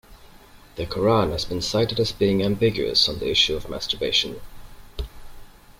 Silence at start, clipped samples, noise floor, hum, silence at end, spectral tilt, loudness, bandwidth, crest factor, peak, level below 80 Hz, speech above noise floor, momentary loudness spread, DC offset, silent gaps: 0.1 s; under 0.1%; -48 dBFS; none; 0.3 s; -4.5 dB/octave; -22 LUFS; 16.5 kHz; 18 dB; -6 dBFS; -42 dBFS; 25 dB; 18 LU; under 0.1%; none